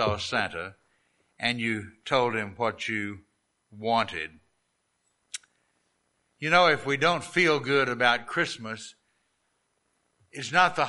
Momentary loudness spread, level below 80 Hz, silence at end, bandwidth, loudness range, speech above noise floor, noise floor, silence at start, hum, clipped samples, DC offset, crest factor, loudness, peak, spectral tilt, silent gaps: 18 LU; -64 dBFS; 0 s; 11.5 kHz; 9 LU; 49 dB; -75 dBFS; 0 s; none; under 0.1%; under 0.1%; 24 dB; -26 LUFS; -4 dBFS; -4 dB/octave; none